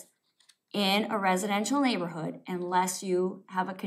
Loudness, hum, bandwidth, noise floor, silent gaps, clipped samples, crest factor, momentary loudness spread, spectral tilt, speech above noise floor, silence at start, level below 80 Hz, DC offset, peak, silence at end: -29 LUFS; none; 16 kHz; -66 dBFS; none; under 0.1%; 16 dB; 9 LU; -4 dB/octave; 37 dB; 0 s; under -90 dBFS; under 0.1%; -12 dBFS; 0 s